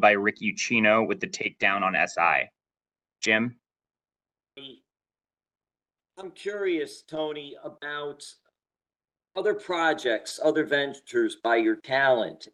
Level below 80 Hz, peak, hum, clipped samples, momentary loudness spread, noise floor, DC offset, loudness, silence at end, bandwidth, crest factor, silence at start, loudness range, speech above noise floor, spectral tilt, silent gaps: -74 dBFS; -6 dBFS; none; under 0.1%; 16 LU; under -90 dBFS; under 0.1%; -25 LUFS; 0.1 s; 12.5 kHz; 22 dB; 0 s; 11 LU; over 64 dB; -3.5 dB/octave; none